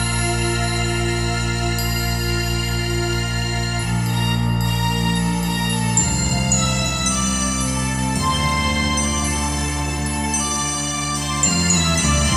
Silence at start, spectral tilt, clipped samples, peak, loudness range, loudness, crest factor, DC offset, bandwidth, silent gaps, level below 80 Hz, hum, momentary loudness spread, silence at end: 0 s; -3.5 dB/octave; under 0.1%; -4 dBFS; 2 LU; -19 LUFS; 16 dB; under 0.1%; 16 kHz; none; -28 dBFS; none; 5 LU; 0 s